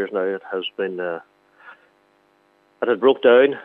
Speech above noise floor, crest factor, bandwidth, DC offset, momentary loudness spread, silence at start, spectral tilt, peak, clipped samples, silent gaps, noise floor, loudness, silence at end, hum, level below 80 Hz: 41 dB; 20 dB; 4 kHz; under 0.1%; 14 LU; 0 s; -7 dB/octave; -2 dBFS; under 0.1%; none; -60 dBFS; -20 LUFS; 0.05 s; none; -84 dBFS